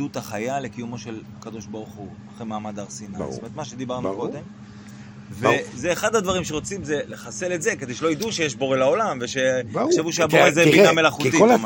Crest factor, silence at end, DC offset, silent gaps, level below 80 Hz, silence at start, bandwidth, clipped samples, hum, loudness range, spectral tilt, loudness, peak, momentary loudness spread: 22 dB; 0 s; under 0.1%; none; -56 dBFS; 0 s; 17 kHz; under 0.1%; none; 14 LU; -4 dB/octave; -21 LUFS; 0 dBFS; 21 LU